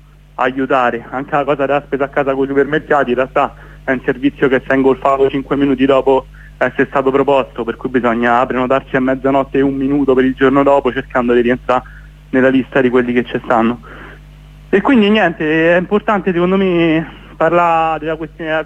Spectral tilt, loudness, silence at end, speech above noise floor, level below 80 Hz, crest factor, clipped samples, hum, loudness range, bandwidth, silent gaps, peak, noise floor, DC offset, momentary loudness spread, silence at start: -7.5 dB/octave; -14 LUFS; 0 s; 23 dB; -40 dBFS; 14 dB; under 0.1%; none; 2 LU; 8 kHz; none; 0 dBFS; -37 dBFS; under 0.1%; 7 LU; 0.4 s